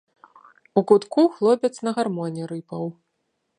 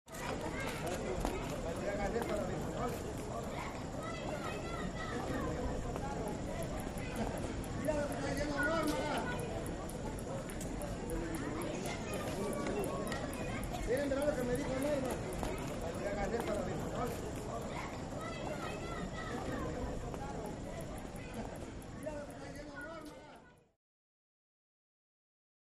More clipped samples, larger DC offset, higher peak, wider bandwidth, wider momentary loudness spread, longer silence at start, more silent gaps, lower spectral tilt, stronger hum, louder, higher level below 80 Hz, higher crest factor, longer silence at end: neither; neither; first, -2 dBFS vs -18 dBFS; second, 10.5 kHz vs 15 kHz; first, 13 LU vs 9 LU; first, 0.75 s vs 0.05 s; neither; first, -7 dB/octave vs -5.5 dB/octave; neither; first, -22 LUFS vs -40 LUFS; second, -76 dBFS vs -50 dBFS; about the same, 20 dB vs 22 dB; second, 0.65 s vs 2.2 s